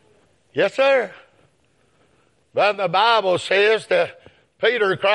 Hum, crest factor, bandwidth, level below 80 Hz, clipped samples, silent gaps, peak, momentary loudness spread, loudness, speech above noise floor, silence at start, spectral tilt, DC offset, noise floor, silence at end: none; 18 dB; 11.5 kHz; -72 dBFS; under 0.1%; none; -2 dBFS; 10 LU; -19 LUFS; 44 dB; 0.55 s; -4 dB/octave; under 0.1%; -62 dBFS; 0 s